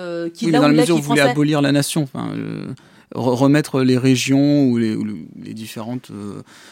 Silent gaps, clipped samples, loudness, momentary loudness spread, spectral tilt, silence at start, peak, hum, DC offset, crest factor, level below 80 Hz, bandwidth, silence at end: none; under 0.1%; -17 LUFS; 18 LU; -5.5 dB/octave; 0 s; 0 dBFS; none; under 0.1%; 16 dB; -62 dBFS; 16.5 kHz; 0.3 s